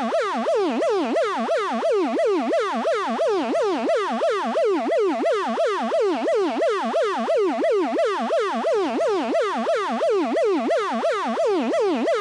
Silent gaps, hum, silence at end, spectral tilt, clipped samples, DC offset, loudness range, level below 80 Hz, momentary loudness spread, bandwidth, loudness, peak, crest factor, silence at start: none; none; 0 s; -4 dB/octave; under 0.1%; under 0.1%; 0 LU; -84 dBFS; 2 LU; 11.5 kHz; -22 LUFS; -14 dBFS; 8 dB; 0 s